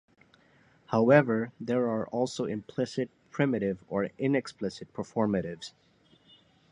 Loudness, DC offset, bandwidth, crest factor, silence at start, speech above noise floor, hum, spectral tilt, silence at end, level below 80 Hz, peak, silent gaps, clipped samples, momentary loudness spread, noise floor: -29 LUFS; under 0.1%; 10.5 kHz; 24 dB; 0.9 s; 34 dB; none; -7 dB/octave; 1 s; -66 dBFS; -6 dBFS; none; under 0.1%; 14 LU; -63 dBFS